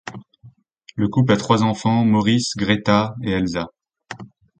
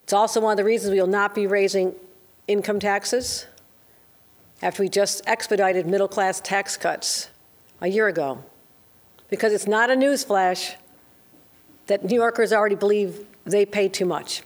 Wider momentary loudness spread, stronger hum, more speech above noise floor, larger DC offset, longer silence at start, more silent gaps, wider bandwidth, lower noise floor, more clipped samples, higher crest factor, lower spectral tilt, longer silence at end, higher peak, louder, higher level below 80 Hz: first, 20 LU vs 9 LU; neither; about the same, 31 dB vs 33 dB; neither; about the same, 0.05 s vs 0.1 s; neither; second, 9.2 kHz vs over 20 kHz; second, -49 dBFS vs -55 dBFS; neither; about the same, 20 dB vs 18 dB; first, -6 dB/octave vs -3.5 dB/octave; first, 0.35 s vs 0.05 s; first, 0 dBFS vs -6 dBFS; first, -19 LUFS vs -22 LUFS; first, -48 dBFS vs -64 dBFS